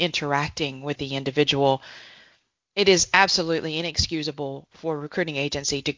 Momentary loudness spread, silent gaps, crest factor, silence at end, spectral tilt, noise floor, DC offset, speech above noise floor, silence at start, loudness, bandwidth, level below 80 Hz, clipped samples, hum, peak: 13 LU; none; 24 dB; 0.05 s; -3 dB/octave; -62 dBFS; under 0.1%; 38 dB; 0 s; -23 LUFS; 7.6 kHz; -46 dBFS; under 0.1%; none; -2 dBFS